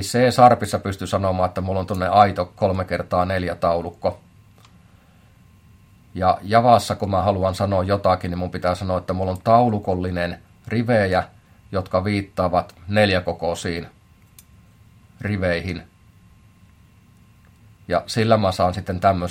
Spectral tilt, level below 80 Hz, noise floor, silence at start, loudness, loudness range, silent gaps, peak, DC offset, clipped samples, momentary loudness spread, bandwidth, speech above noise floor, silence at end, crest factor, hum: -6 dB/octave; -52 dBFS; -52 dBFS; 0 s; -21 LUFS; 9 LU; none; 0 dBFS; under 0.1%; under 0.1%; 11 LU; 16.5 kHz; 32 dB; 0 s; 20 dB; none